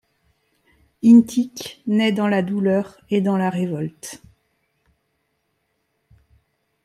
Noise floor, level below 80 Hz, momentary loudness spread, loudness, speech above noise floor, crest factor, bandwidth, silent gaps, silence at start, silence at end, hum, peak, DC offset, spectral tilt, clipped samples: -71 dBFS; -62 dBFS; 18 LU; -19 LUFS; 53 dB; 20 dB; 13 kHz; none; 1.05 s; 2.7 s; none; -2 dBFS; under 0.1%; -6.5 dB/octave; under 0.1%